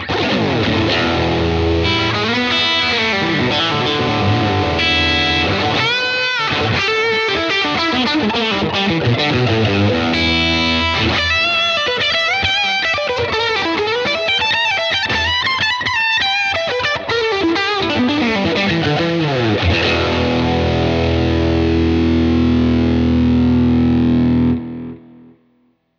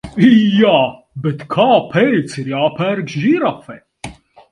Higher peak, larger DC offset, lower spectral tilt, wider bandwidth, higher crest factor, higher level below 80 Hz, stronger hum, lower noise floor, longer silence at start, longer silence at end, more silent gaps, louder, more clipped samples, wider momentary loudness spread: about the same, -2 dBFS vs 0 dBFS; neither; second, -5.5 dB/octave vs -7 dB/octave; second, 7.8 kHz vs 11 kHz; about the same, 14 dB vs 14 dB; first, -32 dBFS vs -50 dBFS; neither; first, -59 dBFS vs -34 dBFS; about the same, 0 s vs 0.05 s; first, 1 s vs 0.4 s; neither; about the same, -15 LUFS vs -14 LUFS; neither; second, 3 LU vs 22 LU